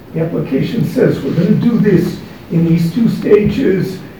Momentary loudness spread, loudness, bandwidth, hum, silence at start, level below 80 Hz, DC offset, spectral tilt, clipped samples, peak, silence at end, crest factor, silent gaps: 7 LU; -13 LUFS; over 20 kHz; none; 0 s; -42 dBFS; 0.5%; -8.5 dB/octave; 0.2%; 0 dBFS; 0 s; 14 dB; none